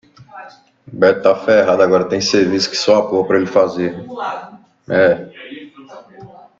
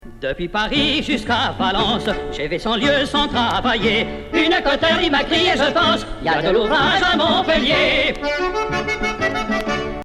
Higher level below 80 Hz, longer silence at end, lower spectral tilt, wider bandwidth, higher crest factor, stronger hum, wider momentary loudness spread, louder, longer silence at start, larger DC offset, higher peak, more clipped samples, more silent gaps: second, -58 dBFS vs -34 dBFS; first, 0.35 s vs 0 s; about the same, -4.5 dB/octave vs -4.5 dB/octave; second, 7.8 kHz vs 13 kHz; about the same, 16 dB vs 14 dB; neither; first, 20 LU vs 6 LU; first, -15 LUFS vs -18 LUFS; first, 0.2 s vs 0.05 s; neither; first, 0 dBFS vs -4 dBFS; neither; neither